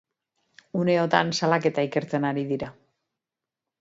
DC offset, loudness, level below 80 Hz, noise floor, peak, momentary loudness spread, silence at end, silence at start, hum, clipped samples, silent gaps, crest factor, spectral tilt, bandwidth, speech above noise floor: under 0.1%; -25 LUFS; -66 dBFS; -88 dBFS; -2 dBFS; 10 LU; 1.1 s; 0.75 s; none; under 0.1%; none; 24 dB; -5.5 dB/octave; 7.8 kHz; 65 dB